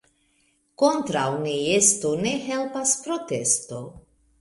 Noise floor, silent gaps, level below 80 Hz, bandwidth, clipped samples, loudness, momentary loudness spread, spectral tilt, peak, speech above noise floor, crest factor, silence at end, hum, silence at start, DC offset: -66 dBFS; none; -60 dBFS; 12 kHz; under 0.1%; -22 LUFS; 10 LU; -3 dB/octave; -4 dBFS; 43 dB; 20 dB; 0.4 s; none; 0.8 s; under 0.1%